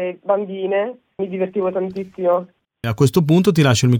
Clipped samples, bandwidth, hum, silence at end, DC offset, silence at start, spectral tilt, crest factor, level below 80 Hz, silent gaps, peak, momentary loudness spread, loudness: under 0.1%; 17.5 kHz; none; 0 s; under 0.1%; 0 s; -6.5 dB/octave; 16 dB; -52 dBFS; none; -2 dBFS; 12 LU; -19 LUFS